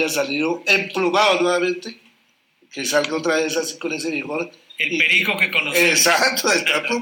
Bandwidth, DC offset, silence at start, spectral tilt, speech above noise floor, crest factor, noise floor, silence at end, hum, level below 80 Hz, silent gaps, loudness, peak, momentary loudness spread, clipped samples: 18.5 kHz; under 0.1%; 0 s; -2 dB/octave; 42 dB; 16 dB; -61 dBFS; 0 s; none; -76 dBFS; none; -18 LUFS; -4 dBFS; 12 LU; under 0.1%